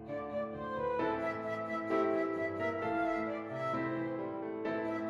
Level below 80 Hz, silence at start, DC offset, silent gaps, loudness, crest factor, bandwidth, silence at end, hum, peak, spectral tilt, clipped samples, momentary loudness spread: -66 dBFS; 0 s; under 0.1%; none; -36 LUFS; 14 dB; 7.6 kHz; 0 s; none; -20 dBFS; -7.5 dB/octave; under 0.1%; 6 LU